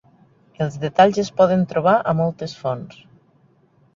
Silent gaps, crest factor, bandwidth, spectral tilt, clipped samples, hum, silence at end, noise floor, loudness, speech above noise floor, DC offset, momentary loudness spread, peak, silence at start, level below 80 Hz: none; 20 dB; 7.6 kHz; -6.5 dB/octave; under 0.1%; none; 1.05 s; -57 dBFS; -19 LUFS; 39 dB; under 0.1%; 11 LU; -2 dBFS; 0.6 s; -58 dBFS